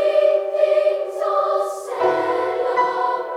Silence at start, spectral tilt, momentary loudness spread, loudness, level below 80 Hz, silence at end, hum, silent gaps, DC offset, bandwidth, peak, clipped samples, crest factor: 0 s; -4 dB/octave; 5 LU; -20 LUFS; -74 dBFS; 0 s; none; none; under 0.1%; 13 kHz; -6 dBFS; under 0.1%; 14 dB